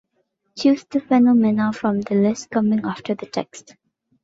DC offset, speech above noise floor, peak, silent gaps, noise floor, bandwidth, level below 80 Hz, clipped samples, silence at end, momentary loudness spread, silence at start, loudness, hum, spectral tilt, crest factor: under 0.1%; 51 dB; -6 dBFS; none; -70 dBFS; 7.8 kHz; -62 dBFS; under 0.1%; 0.65 s; 13 LU; 0.55 s; -20 LUFS; none; -6.5 dB/octave; 14 dB